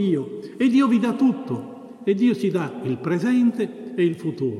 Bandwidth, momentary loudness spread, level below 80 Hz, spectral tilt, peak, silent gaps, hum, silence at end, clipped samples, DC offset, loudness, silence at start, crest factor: 11.5 kHz; 10 LU; -72 dBFS; -7.5 dB/octave; -8 dBFS; none; none; 0 s; under 0.1%; under 0.1%; -22 LUFS; 0 s; 14 dB